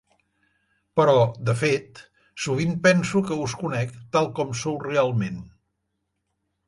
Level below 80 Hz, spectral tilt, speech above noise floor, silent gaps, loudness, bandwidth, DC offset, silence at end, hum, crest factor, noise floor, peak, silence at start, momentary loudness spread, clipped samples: -58 dBFS; -5.5 dB/octave; 55 dB; none; -23 LUFS; 11.5 kHz; under 0.1%; 1.2 s; none; 20 dB; -77 dBFS; -4 dBFS; 0.95 s; 10 LU; under 0.1%